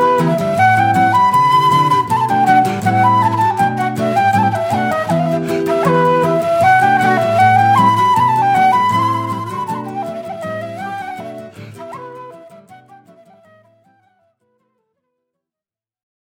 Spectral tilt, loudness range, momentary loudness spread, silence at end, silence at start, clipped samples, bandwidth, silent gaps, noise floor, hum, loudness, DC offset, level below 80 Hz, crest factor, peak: -6 dB/octave; 16 LU; 15 LU; 3.45 s; 0 s; under 0.1%; 17 kHz; none; under -90 dBFS; none; -13 LUFS; under 0.1%; -56 dBFS; 14 dB; 0 dBFS